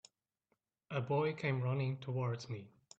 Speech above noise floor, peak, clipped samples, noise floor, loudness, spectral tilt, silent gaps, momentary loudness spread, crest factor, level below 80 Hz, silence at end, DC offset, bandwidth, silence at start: 47 dB; -24 dBFS; under 0.1%; -84 dBFS; -38 LUFS; -7 dB/octave; none; 9 LU; 16 dB; -76 dBFS; 0.3 s; under 0.1%; 8 kHz; 0.9 s